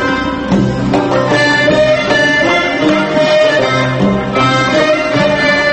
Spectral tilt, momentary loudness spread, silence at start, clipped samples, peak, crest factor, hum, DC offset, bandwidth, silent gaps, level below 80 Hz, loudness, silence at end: -5 dB/octave; 4 LU; 0 s; under 0.1%; 0 dBFS; 12 dB; none; under 0.1%; 8.8 kHz; none; -36 dBFS; -11 LUFS; 0 s